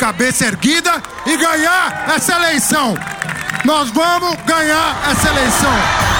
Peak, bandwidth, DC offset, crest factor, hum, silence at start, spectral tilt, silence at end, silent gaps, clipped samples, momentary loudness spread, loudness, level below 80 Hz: 0 dBFS; over 20 kHz; 0.3%; 14 dB; none; 0 s; -3 dB/octave; 0 s; none; under 0.1%; 6 LU; -13 LUFS; -34 dBFS